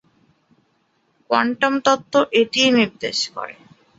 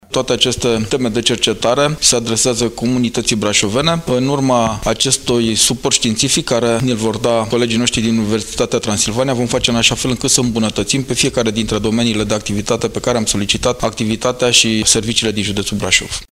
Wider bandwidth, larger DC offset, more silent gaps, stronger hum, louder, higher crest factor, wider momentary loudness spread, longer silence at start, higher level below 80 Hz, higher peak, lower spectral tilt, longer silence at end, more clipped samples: second, 8 kHz vs 16 kHz; neither; neither; neither; second, -18 LUFS vs -14 LUFS; about the same, 18 dB vs 16 dB; first, 9 LU vs 6 LU; first, 1.3 s vs 0.1 s; second, -66 dBFS vs -36 dBFS; about the same, -2 dBFS vs 0 dBFS; about the same, -3 dB/octave vs -3 dB/octave; first, 0.45 s vs 0.05 s; neither